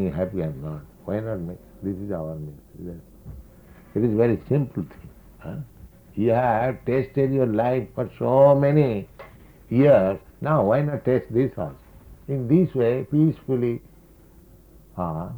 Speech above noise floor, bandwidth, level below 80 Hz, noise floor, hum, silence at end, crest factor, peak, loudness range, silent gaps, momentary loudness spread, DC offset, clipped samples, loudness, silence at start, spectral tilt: 28 dB; over 20 kHz; -50 dBFS; -50 dBFS; none; 0 s; 18 dB; -4 dBFS; 9 LU; none; 21 LU; under 0.1%; under 0.1%; -23 LUFS; 0 s; -10 dB/octave